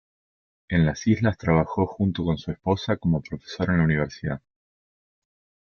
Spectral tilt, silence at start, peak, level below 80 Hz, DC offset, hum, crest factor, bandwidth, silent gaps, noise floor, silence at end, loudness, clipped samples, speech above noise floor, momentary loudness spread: -7.5 dB/octave; 0.7 s; -8 dBFS; -48 dBFS; under 0.1%; none; 18 dB; 6.8 kHz; none; under -90 dBFS; 1.25 s; -24 LUFS; under 0.1%; over 67 dB; 8 LU